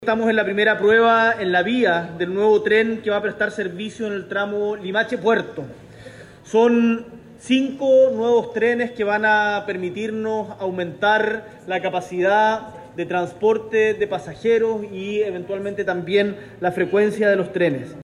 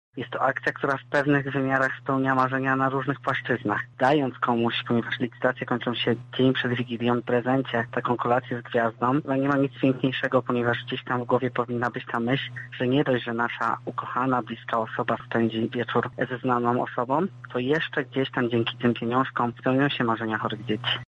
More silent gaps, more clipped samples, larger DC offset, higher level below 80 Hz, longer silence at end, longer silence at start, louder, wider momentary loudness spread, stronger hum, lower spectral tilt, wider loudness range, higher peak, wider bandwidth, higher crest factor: neither; neither; neither; about the same, -60 dBFS vs -64 dBFS; about the same, 0 s vs 0.05 s; second, 0 s vs 0.15 s; first, -20 LUFS vs -25 LUFS; first, 11 LU vs 5 LU; neither; second, -5.5 dB/octave vs -7.5 dB/octave; about the same, 4 LU vs 2 LU; about the same, -6 dBFS vs -8 dBFS; first, 11 kHz vs 8.2 kHz; about the same, 14 dB vs 16 dB